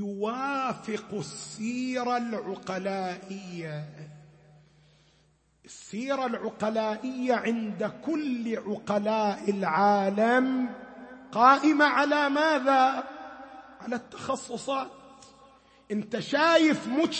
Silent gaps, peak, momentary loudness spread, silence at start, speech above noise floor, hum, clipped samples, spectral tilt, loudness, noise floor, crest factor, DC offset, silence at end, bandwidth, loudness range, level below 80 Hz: none; -6 dBFS; 18 LU; 0 s; 39 dB; none; under 0.1%; -5 dB/octave; -27 LUFS; -65 dBFS; 22 dB; under 0.1%; 0 s; 8.8 kHz; 13 LU; -72 dBFS